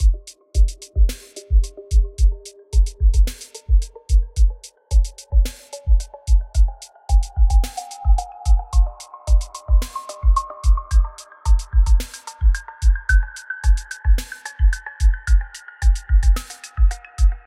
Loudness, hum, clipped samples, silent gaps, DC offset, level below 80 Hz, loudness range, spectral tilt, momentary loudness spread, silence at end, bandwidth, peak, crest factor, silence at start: -21 LUFS; none; under 0.1%; none; under 0.1%; -18 dBFS; 1 LU; -4.5 dB/octave; 9 LU; 0.05 s; 12 kHz; -4 dBFS; 12 dB; 0 s